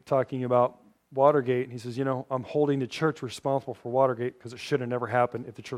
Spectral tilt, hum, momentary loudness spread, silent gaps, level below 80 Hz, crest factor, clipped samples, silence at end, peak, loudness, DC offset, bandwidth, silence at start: -7 dB/octave; none; 10 LU; none; -72 dBFS; 20 dB; under 0.1%; 0 s; -8 dBFS; -27 LUFS; under 0.1%; 13.5 kHz; 0.05 s